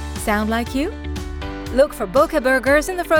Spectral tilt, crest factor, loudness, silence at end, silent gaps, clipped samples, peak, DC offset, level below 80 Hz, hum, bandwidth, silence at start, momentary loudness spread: -5 dB/octave; 14 dB; -19 LUFS; 0 s; none; under 0.1%; -4 dBFS; under 0.1%; -32 dBFS; none; over 20 kHz; 0 s; 13 LU